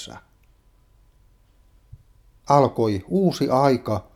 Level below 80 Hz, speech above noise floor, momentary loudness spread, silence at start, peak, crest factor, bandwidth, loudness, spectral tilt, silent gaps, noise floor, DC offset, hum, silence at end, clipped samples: -54 dBFS; 36 dB; 6 LU; 0 s; -2 dBFS; 22 dB; 15.5 kHz; -20 LUFS; -7 dB/octave; none; -57 dBFS; under 0.1%; none; 0.15 s; under 0.1%